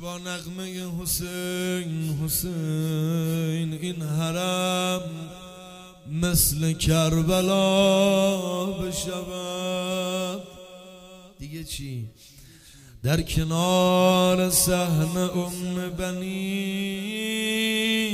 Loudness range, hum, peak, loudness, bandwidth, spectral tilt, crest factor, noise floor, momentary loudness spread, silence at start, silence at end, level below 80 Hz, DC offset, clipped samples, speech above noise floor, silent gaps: 9 LU; none; -6 dBFS; -24 LUFS; 16 kHz; -4.5 dB/octave; 18 dB; -49 dBFS; 17 LU; 0 s; 0 s; -44 dBFS; under 0.1%; under 0.1%; 24 dB; none